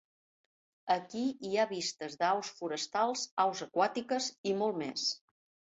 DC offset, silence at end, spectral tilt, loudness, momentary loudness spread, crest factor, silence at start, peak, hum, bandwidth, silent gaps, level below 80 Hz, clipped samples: under 0.1%; 0.6 s; -3 dB/octave; -34 LUFS; 5 LU; 20 dB; 0.85 s; -14 dBFS; none; 8 kHz; 3.31-3.37 s, 4.38-4.44 s; -80 dBFS; under 0.1%